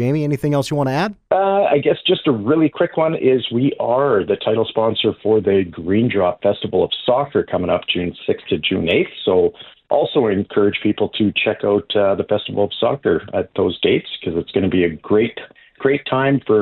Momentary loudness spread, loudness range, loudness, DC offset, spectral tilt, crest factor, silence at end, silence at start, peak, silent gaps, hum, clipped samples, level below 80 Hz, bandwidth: 5 LU; 2 LU; -18 LUFS; under 0.1%; -7 dB/octave; 16 dB; 0 s; 0 s; -2 dBFS; none; none; under 0.1%; -52 dBFS; 10.5 kHz